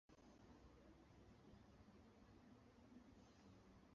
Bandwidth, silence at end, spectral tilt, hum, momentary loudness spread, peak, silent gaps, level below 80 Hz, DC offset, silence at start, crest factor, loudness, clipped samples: 7.2 kHz; 0 s; -6 dB/octave; none; 2 LU; -54 dBFS; none; -76 dBFS; under 0.1%; 0.1 s; 14 dB; -69 LUFS; under 0.1%